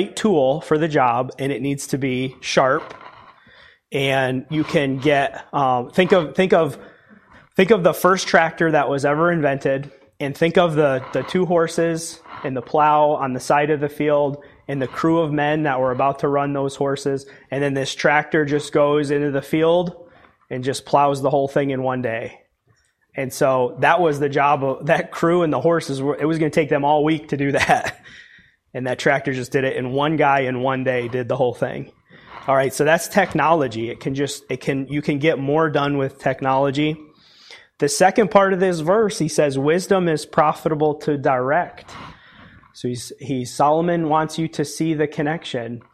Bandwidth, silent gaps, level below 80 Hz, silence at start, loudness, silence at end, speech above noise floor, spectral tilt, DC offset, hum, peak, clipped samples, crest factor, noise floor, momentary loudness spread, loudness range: 15.5 kHz; none; -56 dBFS; 0 s; -19 LUFS; 0.15 s; 43 dB; -5.5 dB/octave; under 0.1%; none; -2 dBFS; under 0.1%; 18 dB; -62 dBFS; 10 LU; 4 LU